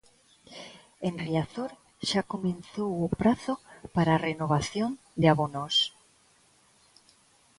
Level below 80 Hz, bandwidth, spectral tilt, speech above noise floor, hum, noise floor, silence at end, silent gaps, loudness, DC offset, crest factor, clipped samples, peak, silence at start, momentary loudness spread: -56 dBFS; 11.5 kHz; -5.5 dB/octave; 35 dB; none; -63 dBFS; 1.7 s; none; -29 LUFS; under 0.1%; 22 dB; under 0.1%; -8 dBFS; 0.5 s; 13 LU